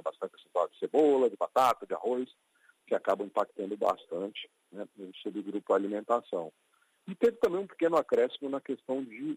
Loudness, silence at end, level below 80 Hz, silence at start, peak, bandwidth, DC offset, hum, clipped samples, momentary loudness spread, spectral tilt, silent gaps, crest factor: -31 LUFS; 0 s; -74 dBFS; 0.05 s; -12 dBFS; 15.5 kHz; under 0.1%; none; under 0.1%; 17 LU; -5.5 dB/octave; none; 18 dB